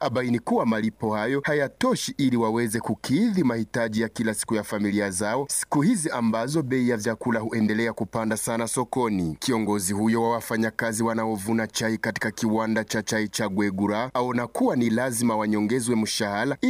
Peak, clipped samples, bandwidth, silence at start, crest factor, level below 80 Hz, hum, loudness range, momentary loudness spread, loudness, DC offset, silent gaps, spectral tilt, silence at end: -12 dBFS; under 0.1%; 15.5 kHz; 0 s; 12 dB; -58 dBFS; none; 1 LU; 4 LU; -25 LUFS; under 0.1%; none; -4.5 dB/octave; 0 s